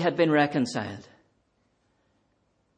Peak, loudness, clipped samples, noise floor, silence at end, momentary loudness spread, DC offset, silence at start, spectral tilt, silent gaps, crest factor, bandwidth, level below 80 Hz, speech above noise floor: -10 dBFS; -25 LUFS; under 0.1%; -71 dBFS; 1.75 s; 16 LU; under 0.1%; 0 s; -6 dB/octave; none; 20 dB; 9.6 kHz; -72 dBFS; 46 dB